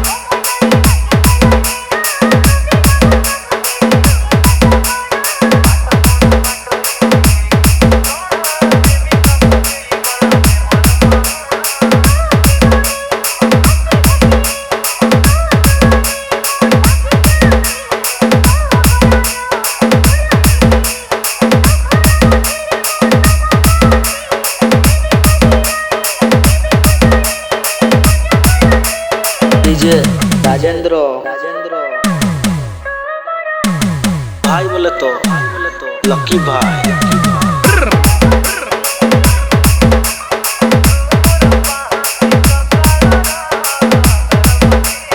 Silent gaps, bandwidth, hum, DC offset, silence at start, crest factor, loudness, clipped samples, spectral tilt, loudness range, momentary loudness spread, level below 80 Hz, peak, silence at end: none; 19.5 kHz; none; under 0.1%; 0 s; 10 dB; -11 LUFS; 0.2%; -5 dB/octave; 3 LU; 6 LU; -16 dBFS; 0 dBFS; 0 s